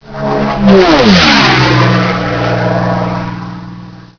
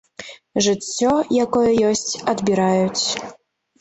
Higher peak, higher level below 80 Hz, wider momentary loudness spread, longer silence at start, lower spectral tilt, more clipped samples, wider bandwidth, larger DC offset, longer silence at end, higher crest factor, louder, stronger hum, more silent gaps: first, 0 dBFS vs -6 dBFS; first, -32 dBFS vs -54 dBFS; first, 17 LU vs 11 LU; second, 0.05 s vs 0.2 s; first, -5.5 dB/octave vs -4 dB/octave; first, 2% vs under 0.1%; second, 5.4 kHz vs 8.2 kHz; neither; second, 0.15 s vs 0.5 s; about the same, 10 dB vs 14 dB; first, -9 LUFS vs -19 LUFS; neither; neither